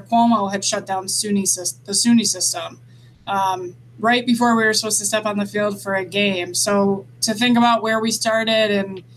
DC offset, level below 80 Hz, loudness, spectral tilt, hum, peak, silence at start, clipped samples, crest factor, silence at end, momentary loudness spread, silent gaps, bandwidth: under 0.1%; -62 dBFS; -18 LUFS; -3 dB/octave; none; -4 dBFS; 0 s; under 0.1%; 16 dB; 0.15 s; 7 LU; none; 15.5 kHz